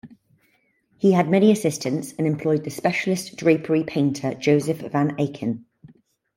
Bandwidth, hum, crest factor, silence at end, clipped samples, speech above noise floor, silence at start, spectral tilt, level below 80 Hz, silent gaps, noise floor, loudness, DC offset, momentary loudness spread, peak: 16.5 kHz; none; 18 dB; 0.75 s; under 0.1%; 44 dB; 0.05 s; -6.5 dB/octave; -64 dBFS; none; -65 dBFS; -22 LUFS; under 0.1%; 8 LU; -4 dBFS